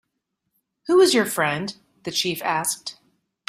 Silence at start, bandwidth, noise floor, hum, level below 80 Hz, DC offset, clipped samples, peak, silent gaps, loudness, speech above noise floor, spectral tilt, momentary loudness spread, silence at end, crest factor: 0.85 s; 16 kHz; -78 dBFS; none; -68 dBFS; under 0.1%; under 0.1%; -6 dBFS; none; -21 LUFS; 57 dB; -3 dB/octave; 19 LU; 0.55 s; 18 dB